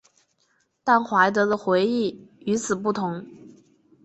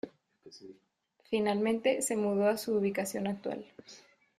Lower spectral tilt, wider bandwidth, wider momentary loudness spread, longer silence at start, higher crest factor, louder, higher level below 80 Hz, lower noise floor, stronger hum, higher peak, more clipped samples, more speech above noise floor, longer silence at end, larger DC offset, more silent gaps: about the same, -5 dB/octave vs -4.5 dB/octave; second, 8.4 kHz vs 15.5 kHz; second, 11 LU vs 22 LU; first, 0.85 s vs 0.05 s; about the same, 20 dB vs 18 dB; first, -23 LUFS vs -31 LUFS; first, -66 dBFS vs -74 dBFS; about the same, -68 dBFS vs -71 dBFS; neither; first, -6 dBFS vs -16 dBFS; neither; first, 46 dB vs 40 dB; first, 0.55 s vs 0.4 s; neither; neither